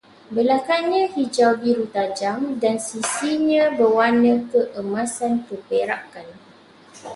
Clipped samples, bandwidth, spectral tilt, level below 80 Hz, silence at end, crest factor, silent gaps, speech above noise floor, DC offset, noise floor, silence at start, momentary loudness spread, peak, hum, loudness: under 0.1%; 11.5 kHz; -4 dB/octave; -66 dBFS; 0 s; 16 dB; none; 29 dB; under 0.1%; -48 dBFS; 0.3 s; 9 LU; -4 dBFS; none; -20 LUFS